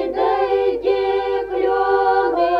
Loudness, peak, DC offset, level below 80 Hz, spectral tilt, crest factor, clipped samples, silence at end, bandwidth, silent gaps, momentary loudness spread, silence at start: -18 LUFS; -6 dBFS; under 0.1%; -48 dBFS; -6 dB/octave; 12 dB; under 0.1%; 0 s; 5.6 kHz; none; 4 LU; 0 s